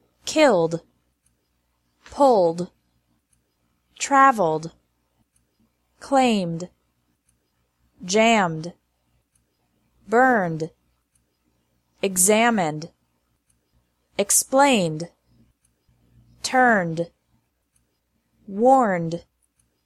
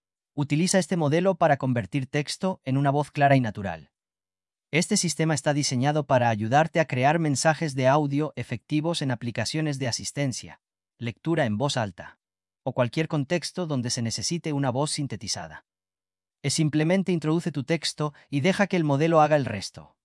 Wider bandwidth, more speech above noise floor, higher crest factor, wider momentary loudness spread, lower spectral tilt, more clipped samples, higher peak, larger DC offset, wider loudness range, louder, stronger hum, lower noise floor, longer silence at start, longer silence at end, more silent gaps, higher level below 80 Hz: first, 15.5 kHz vs 12 kHz; second, 52 dB vs over 65 dB; about the same, 20 dB vs 18 dB; first, 19 LU vs 10 LU; second, -3.5 dB/octave vs -5 dB/octave; neither; first, -2 dBFS vs -8 dBFS; neither; about the same, 4 LU vs 5 LU; first, -20 LUFS vs -25 LUFS; neither; second, -71 dBFS vs under -90 dBFS; about the same, 0.25 s vs 0.35 s; first, 0.65 s vs 0.25 s; neither; about the same, -64 dBFS vs -66 dBFS